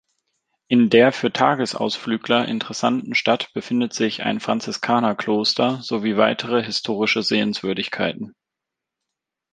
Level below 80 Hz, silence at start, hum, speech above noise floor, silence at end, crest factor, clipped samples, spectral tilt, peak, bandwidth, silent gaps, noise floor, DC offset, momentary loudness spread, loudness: -64 dBFS; 0.7 s; none; 64 dB; 1.25 s; 20 dB; under 0.1%; -4.5 dB/octave; -2 dBFS; 9.4 kHz; none; -84 dBFS; under 0.1%; 7 LU; -20 LUFS